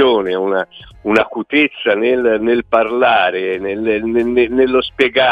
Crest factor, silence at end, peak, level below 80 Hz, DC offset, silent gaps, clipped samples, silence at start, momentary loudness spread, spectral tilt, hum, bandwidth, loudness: 14 dB; 0 s; 0 dBFS; -46 dBFS; under 0.1%; none; under 0.1%; 0 s; 6 LU; -6 dB/octave; none; 7.4 kHz; -15 LUFS